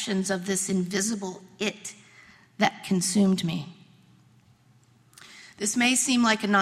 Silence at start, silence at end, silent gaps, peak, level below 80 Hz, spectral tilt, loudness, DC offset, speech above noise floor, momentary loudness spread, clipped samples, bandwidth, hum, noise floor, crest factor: 0 s; 0 s; none; -6 dBFS; -68 dBFS; -3.5 dB/octave; -25 LUFS; under 0.1%; 34 dB; 17 LU; under 0.1%; 15.5 kHz; none; -60 dBFS; 20 dB